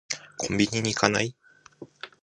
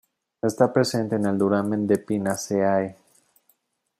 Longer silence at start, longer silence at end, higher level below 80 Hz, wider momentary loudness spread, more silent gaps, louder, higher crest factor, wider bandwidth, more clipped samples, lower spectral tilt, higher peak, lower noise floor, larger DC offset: second, 0.1 s vs 0.45 s; second, 0.15 s vs 1.05 s; first, -56 dBFS vs -66 dBFS; first, 16 LU vs 6 LU; neither; second, -26 LUFS vs -23 LUFS; first, 26 dB vs 20 dB; second, 11 kHz vs 14.5 kHz; neither; second, -3.5 dB/octave vs -6 dB/octave; about the same, -2 dBFS vs -4 dBFS; second, -49 dBFS vs -68 dBFS; neither